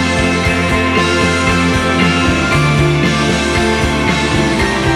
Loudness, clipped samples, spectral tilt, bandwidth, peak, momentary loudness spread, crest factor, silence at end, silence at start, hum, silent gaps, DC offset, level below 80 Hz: -12 LUFS; under 0.1%; -5 dB/octave; 15 kHz; 0 dBFS; 2 LU; 12 dB; 0 s; 0 s; none; none; under 0.1%; -26 dBFS